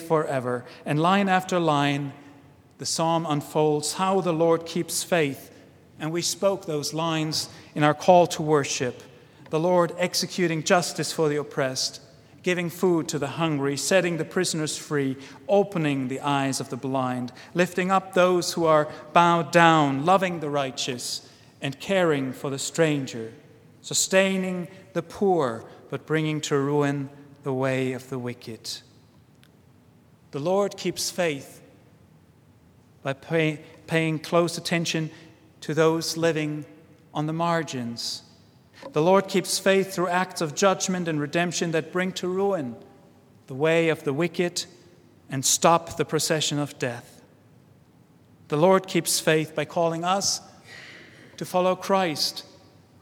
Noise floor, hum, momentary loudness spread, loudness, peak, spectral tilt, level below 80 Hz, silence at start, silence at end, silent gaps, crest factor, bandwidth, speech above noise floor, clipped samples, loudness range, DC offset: -56 dBFS; none; 13 LU; -24 LUFS; -2 dBFS; -4 dB/octave; -70 dBFS; 0 s; 0.6 s; none; 24 dB; 18 kHz; 32 dB; under 0.1%; 6 LU; under 0.1%